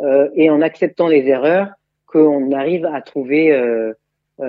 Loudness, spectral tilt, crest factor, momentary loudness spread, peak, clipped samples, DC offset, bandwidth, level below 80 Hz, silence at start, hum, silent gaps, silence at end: -15 LUFS; -9 dB/octave; 14 dB; 9 LU; 0 dBFS; under 0.1%; under 0.1%; 5.2 kHz; -74 dBFS; 0 s; none; none; 0 s